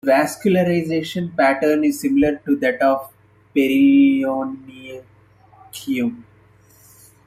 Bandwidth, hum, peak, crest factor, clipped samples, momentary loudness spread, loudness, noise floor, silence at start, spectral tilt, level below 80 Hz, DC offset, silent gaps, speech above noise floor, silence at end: 15.5 kHz; none; -4 dBFS; 16 dB; under 0.1%; 20 LU; -18 LUFS; -51 dBFS; 0.05 s; -6 dB/octave; -54 dBFS; under 0.1%; none; 34 dB; 1.05 s